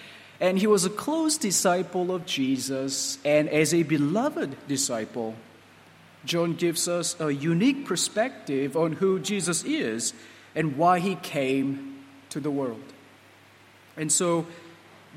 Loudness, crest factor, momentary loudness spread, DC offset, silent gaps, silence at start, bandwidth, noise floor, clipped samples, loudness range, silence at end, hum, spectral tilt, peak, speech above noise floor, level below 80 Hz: -26 LUFS; 18 dB; 12 LU; under 0.1%; none; 0 s; 16 kHz; -54 dBFS; under 0.1%; 4 LU; 0 s; none; -4 dB/octave; -8 dBFS; 28 dB; -72 dBFS